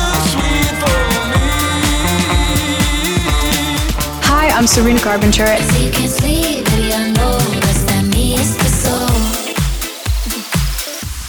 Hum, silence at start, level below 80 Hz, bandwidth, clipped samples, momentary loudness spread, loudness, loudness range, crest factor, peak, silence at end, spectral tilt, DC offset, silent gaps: none; 0 s; -20 dBFS; over 20 kHz; under 0.1%; 7 LU; -14 LUFS; 2 LU; 12 dB; -2 dBFS; 0 s; -4 dB/octave; under 0.1%; none